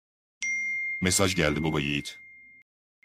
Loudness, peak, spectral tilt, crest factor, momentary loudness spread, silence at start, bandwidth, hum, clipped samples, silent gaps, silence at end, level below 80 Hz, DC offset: -26 LUFS; -8 dBFS; -3.5 dB/octave; 20 dB; 10 LU; 0.4 s; 16 kHz; none; under 0.1%; none; 0.6 s; -50 dBFS; under 0.1%